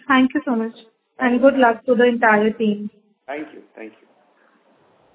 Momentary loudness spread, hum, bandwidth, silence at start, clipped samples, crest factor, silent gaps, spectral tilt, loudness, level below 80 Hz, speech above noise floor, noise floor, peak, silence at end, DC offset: 22 LU; none; 4 kHz; 0.1 s; under 0.1%; 18 dB; none; -9.5 dB/octave; -17 LUFS; -62 dBFS; 40 dB; -58 dBFS; -2 dBFS; 1.25 s; under 0.1%